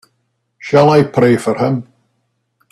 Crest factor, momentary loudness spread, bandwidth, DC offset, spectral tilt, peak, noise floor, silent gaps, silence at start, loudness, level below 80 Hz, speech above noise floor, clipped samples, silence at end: 14 dB; 11 LU; 13 kHz; under 0.1%; -7 dB/octave; 0 dBFS; -67 dBFS; none; 0.65 s; -13 LUFS; -54 dBFS; 55 dB; under 0.1%; 0.9 s